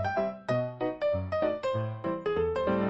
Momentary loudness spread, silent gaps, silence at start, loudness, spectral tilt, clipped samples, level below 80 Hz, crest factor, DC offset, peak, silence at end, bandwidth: 4 LU; none; 0 s; -31 LUFS; -8 dB/octave; under 0.1%; -58 dBFS; 14 dB; under 0.1%; -16 dBFS; 0 s; 8 kHz